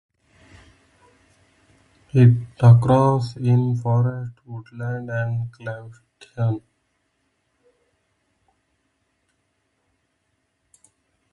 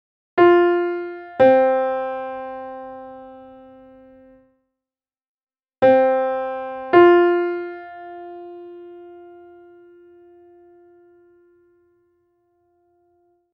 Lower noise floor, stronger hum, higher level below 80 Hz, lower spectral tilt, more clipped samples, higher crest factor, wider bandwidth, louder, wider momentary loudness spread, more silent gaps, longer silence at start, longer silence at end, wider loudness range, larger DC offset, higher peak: second, -71 dBFS vs under -90 dBFS; neither; first, -54 dBFS vs -64 dBFS; about the same, -9 dB/octave vs -8 dB/octave; neither; about the same, 22 dB vs 20 dB; first, 6.6 kHz vs 5 kHz; second, -20 LUFS vs -17 LUFS; second, 20 LU vs 25 LU; second, none vs 5.28-5.35 s, 5.43-5.47 s; first, 2.15 s vs 0.35 s; first, 4.75 s vs 4.4 s; second, 15 LU vs 22 LU; neither; about the same, -2 dBFS vs 0 dBFS